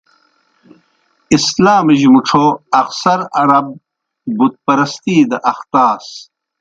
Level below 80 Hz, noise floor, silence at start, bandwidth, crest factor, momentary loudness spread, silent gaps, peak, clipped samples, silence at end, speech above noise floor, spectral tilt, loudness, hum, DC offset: -54 dBFS; -59 dBFS; 1.3 s; 9 kHz; 14 dB; 14 LU; none; 0 dBFS; under 0.1%; 0.4 s; 47 dB; -5 dB/octave; -12 LUFS; none; under 0.1%